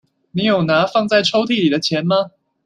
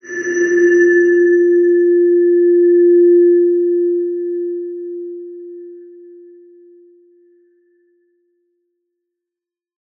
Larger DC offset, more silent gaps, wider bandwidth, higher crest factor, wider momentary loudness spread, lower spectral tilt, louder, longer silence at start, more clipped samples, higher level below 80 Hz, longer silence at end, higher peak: neither; neither; first, 10.5 kHz vs 6.4 kHz; about the same, 16 dB vs 12 dB; second, 5 LU vs 19 LU; about the same, -5.5 dB/octave vs -5 dB/octave; second, -16 LUFS vs -12 LUFS; first, 0.35 s vs 0.05 s; neither; first, -60 dBFS vs -82 dBFS; second, 0.35 s vs 4.15 s; about the same, -2 dBFS vs -4 dBFS